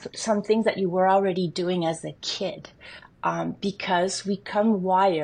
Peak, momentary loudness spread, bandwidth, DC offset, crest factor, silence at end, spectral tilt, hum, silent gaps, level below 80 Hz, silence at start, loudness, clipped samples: -8 dBFS; 10 LU; 10 kHz; under 0.1%; 16 dB; 0 s; -5 dB/octave; none; none; -64 dBFS; 0 s; -25 LUFS; under 0.1%